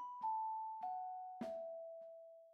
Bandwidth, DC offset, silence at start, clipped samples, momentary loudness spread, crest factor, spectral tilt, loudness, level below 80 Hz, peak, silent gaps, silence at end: 8.6 kHz; under 0.1%; 0 s; under 0.1%; 13 LU; 12 dB; -6.5 dB/octave; -46 LUFS; under -90 dBFS; -34 dBFS; none; 0 s